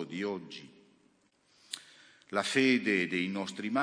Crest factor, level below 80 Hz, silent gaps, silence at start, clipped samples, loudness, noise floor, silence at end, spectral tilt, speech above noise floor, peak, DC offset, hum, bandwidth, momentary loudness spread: 20 dB; -82 dBFS; none; 0 s; under 0.1%; -31 LUFS; -69 dBFS; 0 s; -4 dB/octave; 38 dB; -14 dBFS; under 0.1%; none; 10.5 kHz; 17 LU